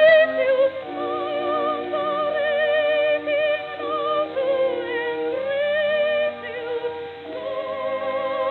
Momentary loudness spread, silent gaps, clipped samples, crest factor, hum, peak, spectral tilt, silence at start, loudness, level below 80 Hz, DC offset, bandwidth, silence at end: 9 LU; none; under 0.1%; 16 dB; none; -6 dBFS; -6.5 dB/octave; 0 s; -23 LUFS; -70 dBFS; under 0.1%; 4.8 kHz; 0 s